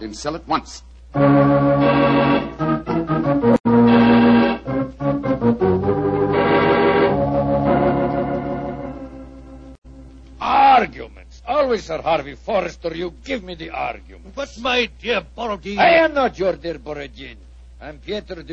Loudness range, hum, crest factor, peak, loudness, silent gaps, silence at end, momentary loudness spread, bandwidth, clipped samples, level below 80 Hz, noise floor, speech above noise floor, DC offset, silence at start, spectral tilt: 8 LU; none; 16 dB; -2 dBFS; -18 LUFS; 3.60-3.64 s, 9.78-9.82 s; 0 s; 18 LU; 8.2 kHz; under 0.1%; -40 dBFS; -40 dBFS; 19 dB; under 0.1%; 0 s; -7 dB/octave